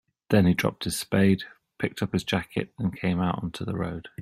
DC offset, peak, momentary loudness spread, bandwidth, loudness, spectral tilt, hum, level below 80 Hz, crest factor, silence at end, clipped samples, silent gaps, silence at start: under 0.1%; -6 dBFS; 10 LU; 15.5 kHz; -27 LUFS; -6 dB/octave; none; -54 dBFS; 20 dB; 0 s; under 0.1%; none; 0.3 s